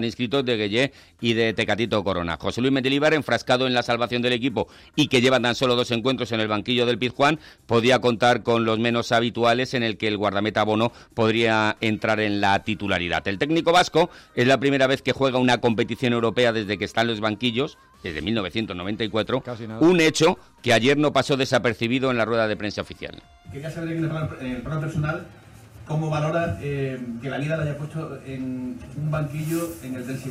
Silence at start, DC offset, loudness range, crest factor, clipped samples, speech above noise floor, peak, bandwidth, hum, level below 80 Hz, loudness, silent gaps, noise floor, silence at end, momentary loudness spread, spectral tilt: 0 s; under 0.1%; 7 LU; 14 dB; under 0.1%; 22 dB; -8 dBFS; 16 kHz; none; -54 dBFS; -22 LUFS; none; -45 dBFS; 0 s; 12 LU; -5 dB/octave